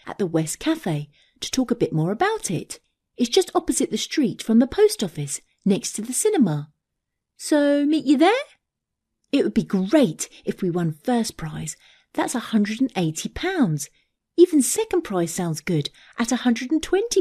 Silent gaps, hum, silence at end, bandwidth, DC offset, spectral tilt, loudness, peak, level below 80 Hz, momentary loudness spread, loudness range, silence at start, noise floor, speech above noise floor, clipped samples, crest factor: none; none; 0 s; 14 kHz; under 0.1%; -5 dB/octave; -22 LUFS; -4 dBFS; -52 dBFS; 12 LU; 3 LU; 0.05 s; -82 dBFS; 60 dB; under 0.1%; 18 dB